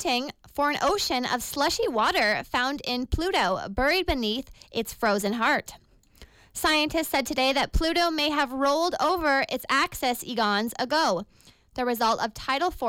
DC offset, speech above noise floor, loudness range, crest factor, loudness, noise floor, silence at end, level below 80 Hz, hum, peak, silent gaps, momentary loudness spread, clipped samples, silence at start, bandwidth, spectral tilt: under 0.1%; 28 dB; 2 LU; 12 dB; -25 LUFS; -53 dBFS; 0 s; -42 dBFS; none; -14 dBFS; none; 6 LU; under 0.1%; 0 s; 17 kHz; -3 dB/octave